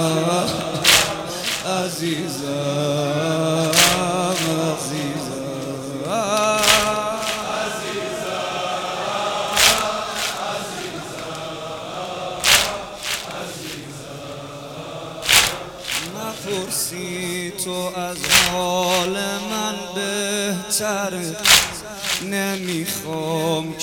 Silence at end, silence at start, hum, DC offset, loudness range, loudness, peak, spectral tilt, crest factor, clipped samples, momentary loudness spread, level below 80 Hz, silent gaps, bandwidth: 0 s; 0 s; none; under 0.1%; 3 LU; -20 LUFS; 0 dBFS; -2.5 dB/octave; 22 dB; under 0.1%; 15 LU; -48 dBFS; none; 19.5 kHz